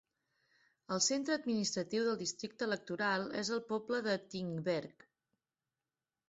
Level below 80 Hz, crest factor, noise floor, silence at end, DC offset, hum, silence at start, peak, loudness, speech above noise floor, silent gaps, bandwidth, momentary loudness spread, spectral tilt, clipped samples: -80 dBFS; 18 dB; under -90 dBFS; 1.4 s; under 0.1%; none; 0.9 s; -20 dBFS; -36 LUFS; over 53 dB; none; 8 kHz; 7 LU; -3 dB/octave; under 0.1%